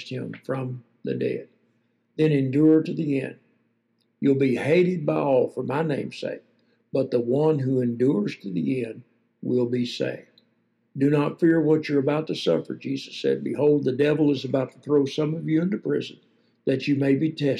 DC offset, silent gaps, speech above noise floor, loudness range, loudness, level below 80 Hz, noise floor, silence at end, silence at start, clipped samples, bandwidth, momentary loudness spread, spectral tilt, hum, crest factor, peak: under 0.1%; none; 47 dB; 3 LU; -24 LUFS; -76 dBFS; -70 dBFS; 0 s; 0 s; under 0.1%; 10.5 kHz; 12 LU; -8 dB/octave; none; 14 dB; -10 dBFS